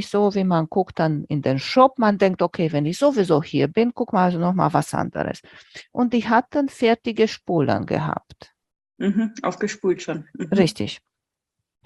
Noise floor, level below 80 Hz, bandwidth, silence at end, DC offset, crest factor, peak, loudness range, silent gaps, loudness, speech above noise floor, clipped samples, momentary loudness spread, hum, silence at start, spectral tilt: -84 dBFS; -58 dBFS; 12.5 kHz; 0.9 s; under 0.1%; 20 dB; -2 dBFS; 5 LU; none; -21 LUFS; 64 dB; under 0.1%; 10 LU; none; 0 s; -6.5 dB/octave